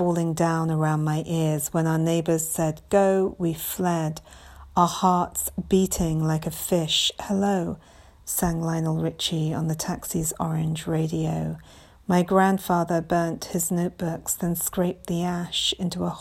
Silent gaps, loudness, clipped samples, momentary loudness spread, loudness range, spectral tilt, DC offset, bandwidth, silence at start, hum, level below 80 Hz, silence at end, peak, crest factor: none; -24 LUFS; under 0.1%; 7 LU; 3 LU; -5 dB/octave; under 0.1%; 16.5 kHz; 0 s; none; -48 dBFS; 0 s; -4 dBFS; 20 dB